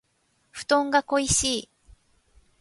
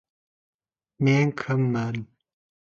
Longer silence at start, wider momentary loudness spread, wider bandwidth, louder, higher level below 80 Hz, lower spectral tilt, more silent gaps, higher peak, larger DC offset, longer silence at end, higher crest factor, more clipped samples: second, 0.55 s vs 1 s; first, 13 LU vs 10 LU; first, 11.5 kHz vs 7.2 kHz; about the same, -23 LUFS vs -24 LUFS; first, -48 dBFS vs -64 dBFS; second, -2.5 dB/octave vs -7.5 dB/octave; neither; about the same, -8 dBFS vs -10 dBFS; neither; first, 1 s vs 0.65 s; about the same, 20 dB vs 16 dB; neither